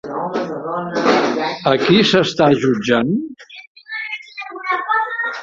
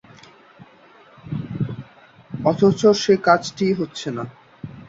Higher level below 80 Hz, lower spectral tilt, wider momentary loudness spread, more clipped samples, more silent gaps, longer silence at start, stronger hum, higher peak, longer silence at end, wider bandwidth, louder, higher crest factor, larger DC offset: about the same, -56 dBFS vs -56 dBFS; about the same, -5.5 dB/octave vs -6 dB/octave; second, 16 LU vs 21 LU; neither; first, 3.67-3.75 s vs none; second, 0.05 s vs 0.6 s; neither; about the same, 0 dBFS vs -2 dBFS; about the same, 0 s vs 0.05 s; about the same, 7.8 kHz vs 7.8 kHz; first, -17 LUFS vs -20 LUFS; about the same, 16 dB vs 20 dB; neither